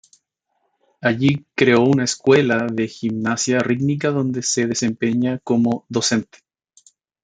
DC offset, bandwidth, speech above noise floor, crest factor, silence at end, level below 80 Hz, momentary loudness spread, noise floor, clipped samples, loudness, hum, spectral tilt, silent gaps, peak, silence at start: under 0.1%; 9.6 kHz; 53 dB; 20 dB; 1 s; -60 dBFS; 7 LU; -71 dBFS; under 0.1%; -19 LUFS; none; -4.5 dB/octave; none; 0 dBFS; 1 s